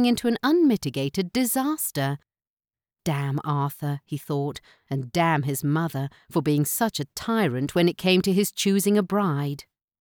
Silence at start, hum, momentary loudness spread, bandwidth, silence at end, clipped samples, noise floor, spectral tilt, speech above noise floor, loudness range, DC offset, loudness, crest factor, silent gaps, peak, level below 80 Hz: 0 s; none; 11 LU; over 20 kHz; 0.4 s; under 0.1%; under -90 dBFS; -5.5 dB/octave; over 66 dB; 5 LU; under 0.1%; -24 LUFS; 18 dB; 2.47-2.57 s; -8 dBFS; -60 dBFS